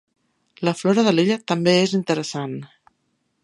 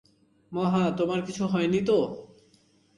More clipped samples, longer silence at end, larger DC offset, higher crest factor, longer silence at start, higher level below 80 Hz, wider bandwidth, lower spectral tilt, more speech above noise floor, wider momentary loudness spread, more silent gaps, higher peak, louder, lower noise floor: neither; about the same, 0.8 s vs 0.75 s; neither; about the same, 18 dB vs 14 dB; about the same, 0.6 s vs 0.5 s; about the same, -68 dBFS vs -64 dBFS; about the same, 11.5 kHz vs 11 kHz; second, -5.5 dB/octave vs -7 dB/octave; first, 51 dB vs 37 dB; about the same, 12 LU vs 10 LU; neither; first, -4 dBFS vs -12 dBFS; first, -20 LUFS vs -27 LUFS; first, -70 dBFS vs -63 dBFS